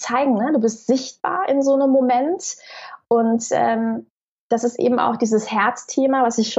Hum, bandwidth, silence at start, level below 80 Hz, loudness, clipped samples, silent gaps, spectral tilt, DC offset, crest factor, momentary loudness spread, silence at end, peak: none; 8.2 kHz; 0 s; -72 dBFS; -19 LUFS; under 0.1%; 4.10-4.50 s; -4.5 dB/octave; under 0.1%; 14 dB; 9 LU; 0 s; -4 dBFS